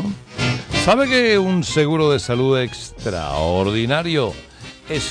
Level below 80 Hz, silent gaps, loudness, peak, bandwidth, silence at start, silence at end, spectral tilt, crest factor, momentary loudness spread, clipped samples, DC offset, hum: -40 dBFS; none; -18 LUFS; -4 dBFS; 10.5 kHz; 0 s; 0 s; -5 dB/octave; 14 dB; 12 LU; under 0.1%; under 0.1%; none